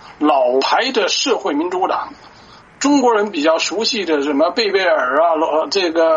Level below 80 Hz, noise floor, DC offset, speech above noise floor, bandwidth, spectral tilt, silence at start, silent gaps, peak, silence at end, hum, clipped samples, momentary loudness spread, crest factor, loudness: -60 dBFS; -43 dBFS; under 0.1%; 27 dB; 7.8 kHz; -2 dB/octave; 0.05 s; none; -2 dBFS; 0 s; none; under 0.1%; 5 LU; 14 dB; -16 LUFS